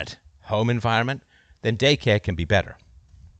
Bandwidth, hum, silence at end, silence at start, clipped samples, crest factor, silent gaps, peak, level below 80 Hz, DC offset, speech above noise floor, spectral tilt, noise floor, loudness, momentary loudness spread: 8.4 kHz; none; 0.15 s; 0 s; under 0.1%; 18 dB; none; -6 dBFS; -46 dBFS; under 0.1%; 28 dB; -5.5 dB/octave; -50 dBFS; -22 LUFS; 15 LU